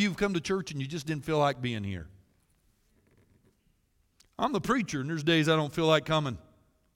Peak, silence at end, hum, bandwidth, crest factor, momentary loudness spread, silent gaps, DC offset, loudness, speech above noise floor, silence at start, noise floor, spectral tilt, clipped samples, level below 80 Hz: -10 dBFS; 0.55 s; none; 16.5 kHz; 20 dB; 11 LU; none; under 0.1%; -29 LUFS; 42 dB; 0 s; -71 dBFS; -5.5 dB/octave; under 0.1%; -58 dBFS